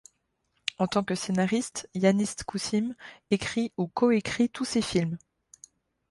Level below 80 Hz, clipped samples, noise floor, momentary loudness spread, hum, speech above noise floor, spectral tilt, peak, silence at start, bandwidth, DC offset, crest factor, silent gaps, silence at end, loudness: -60 dBFS; under 0.1%; -75 dBFS; 10 LU; none; 48 dB; -5 dB/octave; -8 dBFS; 0.8 s; 11.5 kHz; under 0.1%; 22 dB; none; 0.95 s; -28 LUFS